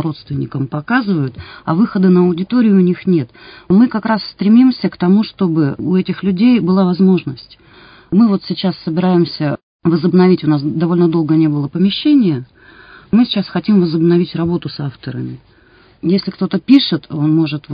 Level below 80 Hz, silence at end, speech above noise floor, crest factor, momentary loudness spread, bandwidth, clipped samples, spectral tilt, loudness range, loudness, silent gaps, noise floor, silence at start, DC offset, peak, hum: -50 dBFS; 0 s; 34 dB; 14 dB; 10 LU; 5.2 kHz; under 0.1%; -10.5 dB/octave; 3 LU; -14 LUFS; 9.63-9.80 s; -48 dBFS; 0 s; under 0.1%; 0 dBFS; none